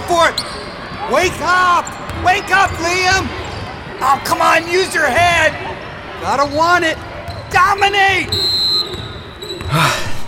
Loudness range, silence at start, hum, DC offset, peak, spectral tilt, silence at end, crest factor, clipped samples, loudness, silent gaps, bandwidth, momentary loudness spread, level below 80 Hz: 1 LU; 0 s; none; under 0.1%; -2 dBFS; -3 dB/octave; 0 s; 14 dB; under 0.1%; -14 LUFS; none; 17 kHz; 15 LU; -38 dBFS